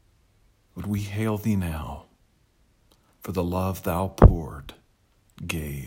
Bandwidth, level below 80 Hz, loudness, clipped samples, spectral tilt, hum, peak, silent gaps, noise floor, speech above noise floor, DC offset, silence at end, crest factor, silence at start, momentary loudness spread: 16.5 kHz; -32 dBFS; -25 LUFS; under 0.1%; -7.5 dB/octave; none; 0 dBFS; none; -63 dBFS; 40 dB; under 0.1%; 0 s; 26 dB; 0.75 s; 24 LU